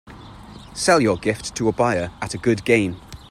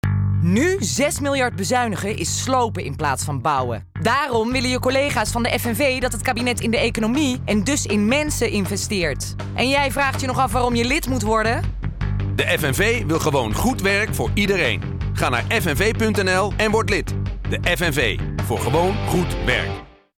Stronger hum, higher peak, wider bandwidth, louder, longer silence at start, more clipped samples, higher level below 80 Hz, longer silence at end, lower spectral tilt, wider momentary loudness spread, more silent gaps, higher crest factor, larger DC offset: neither; first, -4 dBFS vs -8 dBFS; second, 15 kHz vs 18 kHz; about the same, -20 LUFS vs -20 LUFS; about the same, 0.05 s vs 0.05 s; neither; second, -46 dBFS vs -34 dBFS; second, 0.05 s vs 0.3 s; about the same, -4.5 dB/octave vs -4.5 dB/octave; first, 21 LU vs 5 LU; neither; first, 18 dB vs 12 dB; neither